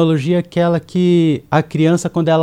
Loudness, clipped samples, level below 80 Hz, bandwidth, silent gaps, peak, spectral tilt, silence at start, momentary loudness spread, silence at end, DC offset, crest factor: -15 LUFS; under 0.1%; -52 dBFS; 10.5 kHz; none; -2 dBFS; -7 dB/octave; 0 s; 4 LU; 0 s; under 0.1%; 12 dB